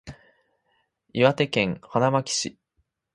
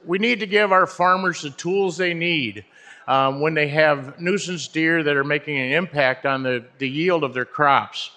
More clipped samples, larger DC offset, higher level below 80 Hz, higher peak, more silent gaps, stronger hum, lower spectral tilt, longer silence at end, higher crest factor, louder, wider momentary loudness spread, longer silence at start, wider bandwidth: neither; neither; first, -58 dBFS vs -68 dBFS; about the same, -4 dBFS vs -2 dBFS; neither; neither; about the same, -4.5 dB/octave vs -4.5 dB/octave; first, 0.65 s vs 0.1 s; about the same, 22 dB vs 20 dB; second, -24 LUFS vs -20 LUFS; about the same, 9 LU vs 8 LU; about the same, 0.05 s vs 0.05 s; first, 11.5 kHz vs 9.8 kHz